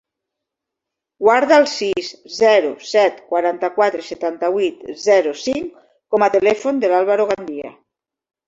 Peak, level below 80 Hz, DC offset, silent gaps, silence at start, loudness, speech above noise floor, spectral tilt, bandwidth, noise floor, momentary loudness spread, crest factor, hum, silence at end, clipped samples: 0 dBFS; -62 dBFS; under 0.1%; none; 1.2 s; -17 LUFS; 66 dB; -3.5 dB/octave; 8 kHz; -83 dBFS; 11 LU; 16 dB; none; 0.75 s; under 0.1%